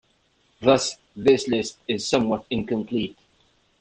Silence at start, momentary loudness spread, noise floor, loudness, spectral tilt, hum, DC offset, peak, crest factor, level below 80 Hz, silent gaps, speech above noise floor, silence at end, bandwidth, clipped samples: 0.6 s; 8 LU; -65 dBFS; -23 LUFS; -4.5 dB/octave; none; under 0.1%; -4 dBFS; 20 dB; -56 dBFS; none; 42 dB; 0.7 s; 9.8 kHz; under 0.1%